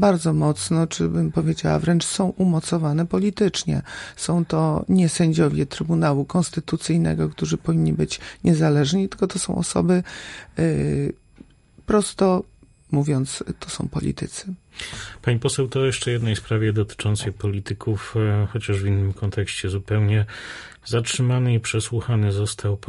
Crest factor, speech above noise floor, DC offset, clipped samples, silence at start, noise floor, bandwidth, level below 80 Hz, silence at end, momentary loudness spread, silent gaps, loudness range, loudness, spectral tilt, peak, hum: 16 dB; 28 dB; under 0.1%; under 0.1%; 0 s; -49 dBFS; 11.5 kHz; -42 dBFS; 0.1 s; 10 LU; none; 3 LU; -22 LUFS; -6 dB/octave; -4 dBFS; none